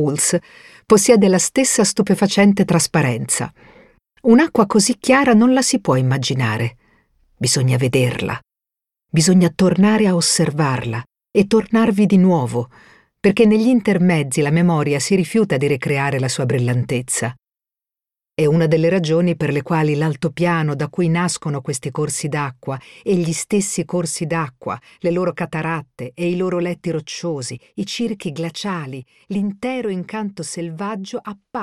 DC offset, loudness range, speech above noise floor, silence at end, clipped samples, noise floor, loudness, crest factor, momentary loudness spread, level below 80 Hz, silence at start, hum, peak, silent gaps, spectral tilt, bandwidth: under 0.1%; 8 LU; 73 dB; 0 s; under 0.1%; -90 dBFS; -17 LUFS; 16 dB; 13 LU; -54 dBFS; 0 s; none; 0 dBFS; none; -5 dB/octave; 14 kHz